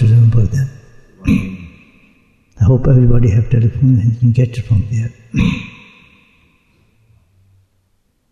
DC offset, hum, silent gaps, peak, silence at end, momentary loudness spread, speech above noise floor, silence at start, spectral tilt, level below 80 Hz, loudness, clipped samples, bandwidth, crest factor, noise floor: under 0.1%; none; none; -2 dBFS; 2.6 s; 13 LU; 49 dB; 0 s; -9 dB/octave; -26 dBFS; -14 LUFS; under 0.1%; 7.2 kHz; 12 dB; -61 dBFS